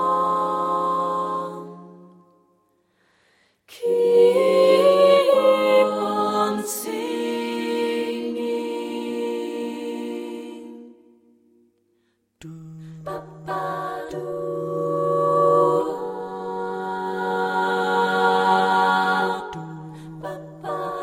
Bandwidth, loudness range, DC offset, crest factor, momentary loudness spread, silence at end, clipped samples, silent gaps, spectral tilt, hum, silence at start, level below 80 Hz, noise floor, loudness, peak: 16 kHz; 16 LU; under 0.1%; 18 dB; 19 LU; 0 s; under 0.1%; none; -5 dB/octave; none; 0 s; -66 dBFS; -68 dBFS; -21 LUFS; -4 dBFS